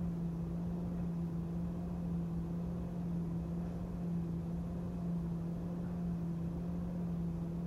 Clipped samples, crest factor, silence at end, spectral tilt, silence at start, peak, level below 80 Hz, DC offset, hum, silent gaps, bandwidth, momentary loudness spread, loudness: under 0.1%; 10 dB; 0 s; -10 dB/octave; 0 s; -30 dBFS; -50 dBFS; under 0.1%; none; none; 6.6 kHz; 2 LU; -40 LUFS